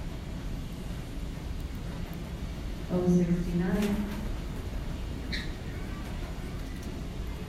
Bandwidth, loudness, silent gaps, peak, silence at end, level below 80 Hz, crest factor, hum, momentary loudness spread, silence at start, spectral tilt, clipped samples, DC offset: 15 kHz; -34 LUFS; none; -14 dBFS; 0 s; -38 dBFS; 18 dB; none; 11 LU; 0 s; -7 dB/octave; under 0.1%; under 0.1%